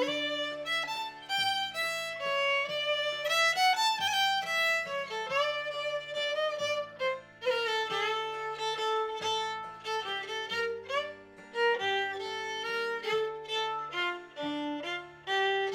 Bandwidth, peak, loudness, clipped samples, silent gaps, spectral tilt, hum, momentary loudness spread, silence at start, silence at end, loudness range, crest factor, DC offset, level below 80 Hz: 17 kHz; -16 dBFS; -31 LUFS; under 0.1%; none; -1.5 dB/octave; none; 8 LU; 0 s; 0 s; 5 LU; 16 dB; under 0.1%; -74 dBFS